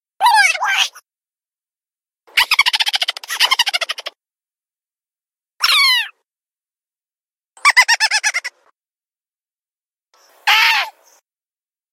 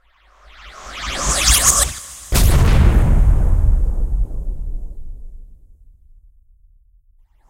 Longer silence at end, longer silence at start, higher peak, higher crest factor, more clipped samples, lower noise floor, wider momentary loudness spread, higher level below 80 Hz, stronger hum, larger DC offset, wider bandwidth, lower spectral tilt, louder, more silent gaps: second, 1.05 s vs 2.05 s; second, 0.2 s vs 0.65 s; about the same, 0 dBFS vs 0 dBFS; about the same, 20 dB vs 16 dB; neither; first, under -90 dBFS vs -52 dBFS; second, 12 LU vs 21 LU; second, -68 dBFS vs -18 dBFS; neither; neither; about the same, 16.5 kHz vs 16 kHz; second, 5 dB/octave vs -3 dB/octave; about the same, -14 LUFS vs -16 LUFS; neither